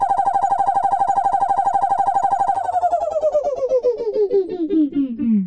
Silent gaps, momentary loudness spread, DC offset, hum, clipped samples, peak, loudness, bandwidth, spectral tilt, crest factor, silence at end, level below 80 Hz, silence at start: none; 3 LU; under 0.1%; none; under 0.1%; -8 dBFS; -19 LUFS; 9.6 kHz; -7.5 dB/octave; 10 dB; 0 s; -54 dBFS; 0 s